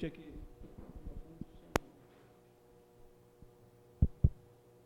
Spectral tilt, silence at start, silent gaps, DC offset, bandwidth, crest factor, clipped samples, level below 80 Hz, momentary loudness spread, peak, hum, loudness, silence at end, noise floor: -7 dB/octave; 0 s; none; under 0.1%; 17 kHz; 36 dB; under 0.1%; -44 dBFS; 28 LU; -6 dBFS; none; -37 LUFS; 0.5 s; -63 dBFS